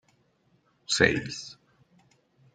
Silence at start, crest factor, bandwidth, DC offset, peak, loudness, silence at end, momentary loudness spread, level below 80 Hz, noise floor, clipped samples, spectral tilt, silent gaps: 0.9 s; 28 dB; 9.6 kHz; under 0.1%; -4 dBFS; -26 LUFS; 1 s; 22 LU; -58 dBFS; -68 dBFS; under 0.1%; -3 dB/octave; none